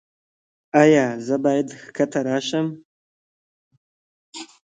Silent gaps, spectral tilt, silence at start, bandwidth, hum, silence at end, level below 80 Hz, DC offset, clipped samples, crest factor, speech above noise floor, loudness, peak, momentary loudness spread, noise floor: 2.85-3.71 s, 3.77-4.32 s; -5.5 dB/octave; 0.75 s; 9.2 kHz; none; 0.25 s; -70 dBFS; under 0.1%; under 0.1%; 22 dB; over 71 dB; -20 LUFS; -2 dBFS; 22 LU; under -90 dBFS